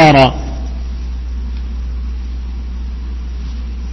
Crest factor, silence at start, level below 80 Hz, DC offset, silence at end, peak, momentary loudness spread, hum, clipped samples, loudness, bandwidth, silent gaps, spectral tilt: 16 dB; 0 s; -22 dBFS; under 0.1%; 0 s; 0 dBFS; 12 LU; none; 0.2%; -19 LUFS; 7.8 kHz; none; -6.5 dB/octave